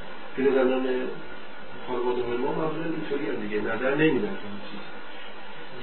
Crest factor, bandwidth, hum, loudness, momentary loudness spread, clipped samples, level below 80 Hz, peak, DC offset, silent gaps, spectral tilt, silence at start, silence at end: 18 dB; 4.4 kHz; none; -27 LUFS; 18 LU; under 0.1%; -58 dBFS; -10 dBFS; 3%; none; -10 dB/octave; 0 s; 0 s